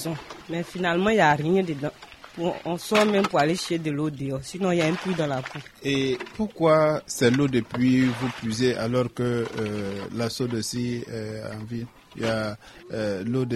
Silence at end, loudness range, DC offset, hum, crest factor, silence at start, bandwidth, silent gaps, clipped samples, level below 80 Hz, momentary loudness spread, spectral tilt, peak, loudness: 0 s; 7 LU; under 0.1%; none; 20 dB; 0 s; 13.5 kHz; none; under 0.1%; -56 dBFS; 13 LU; -5.5 dB/octave; -6 dBFS; -25 LUFS